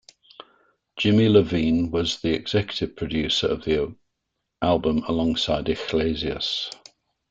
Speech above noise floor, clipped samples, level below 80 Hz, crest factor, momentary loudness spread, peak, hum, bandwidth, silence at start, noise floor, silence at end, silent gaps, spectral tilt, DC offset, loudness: 57 dB; under 0.1%; -46 dBFS; 20 dB; 10 LU; -4 dBFS; none; 7.8 kHz; 0.95 s; -79 dBFS; 0.55 s; none; -6 dB/octave; under 0.1%; -23 LUFS